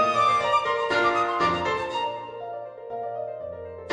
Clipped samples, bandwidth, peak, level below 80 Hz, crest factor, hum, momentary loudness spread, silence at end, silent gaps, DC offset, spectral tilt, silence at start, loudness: under 0.1%; 10 kHz; -10 dBFS; -58 dBFS; 16 dB; none; 15 LU; 0 s; none; under 0.1%; -4 dB/octave; 0 s; -24 LUFS